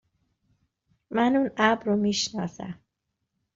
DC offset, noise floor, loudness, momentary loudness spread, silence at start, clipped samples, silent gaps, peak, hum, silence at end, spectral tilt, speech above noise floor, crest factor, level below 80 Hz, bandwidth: under 0.1%; -81 dBFS; -25 LUFS; 17 LU; 1.1 s; under 0.1%; none; -6 dBFS; none; 0.8 s; -3.5 dB/octave; 56 dB; 22 dB; -64 dBFS; 7.8 kHz